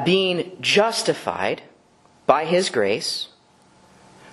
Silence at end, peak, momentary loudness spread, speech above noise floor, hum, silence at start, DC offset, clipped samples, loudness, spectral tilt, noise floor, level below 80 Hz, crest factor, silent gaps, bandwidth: 1.05 s; 0 dBFS; 10 LU; 35 dB; none; 0 s; under 0.1%; under 0.1%; -21 LUFS; -3.5 dB/octave; -56 dBFS; -66 dBFS; 22 dB; none; 12 kHz